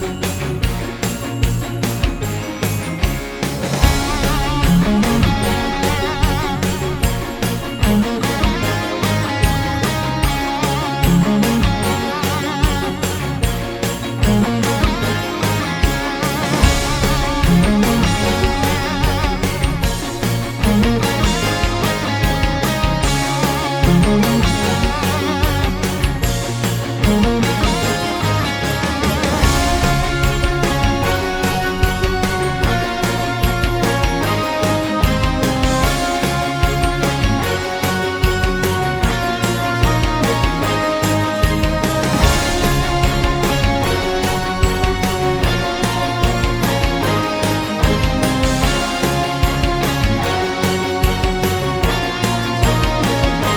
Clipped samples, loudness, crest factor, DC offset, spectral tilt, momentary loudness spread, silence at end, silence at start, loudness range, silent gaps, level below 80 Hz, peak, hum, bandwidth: under 0.1%; -17 LUFS; 16 dB; under 0.1%; -5 dB/octave; 5 LU; 0 s; 0 s; 2 LU; none; -24 dBFS; 0 dBFS; none; over 20 kHz